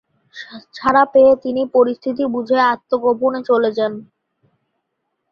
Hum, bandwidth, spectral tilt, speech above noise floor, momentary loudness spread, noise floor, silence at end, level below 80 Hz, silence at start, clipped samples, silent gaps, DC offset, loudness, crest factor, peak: none; 6.6 kHz; -6.5 dB/octave; 58 dB; 22 LU; -74 dBFS; 1.3 s; -58 dBFS; 0.35 s; under 0.1%; none; under 0.1%; -16 LUFS; 16 dB; 0 dBFS